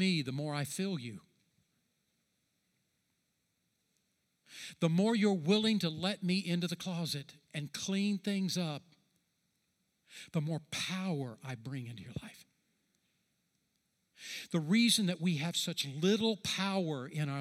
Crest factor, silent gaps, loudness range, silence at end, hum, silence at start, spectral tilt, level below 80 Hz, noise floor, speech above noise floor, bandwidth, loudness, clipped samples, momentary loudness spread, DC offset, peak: 20 dB; none; 11 LU; 0 s; none; 0 s; -5 dB/octave; -76 dBFS; -81 dBFS; 46 dB; 15 kHz; -34 LUFS; under 0.1%; 17 LU; under 0.1%; -16 dBFS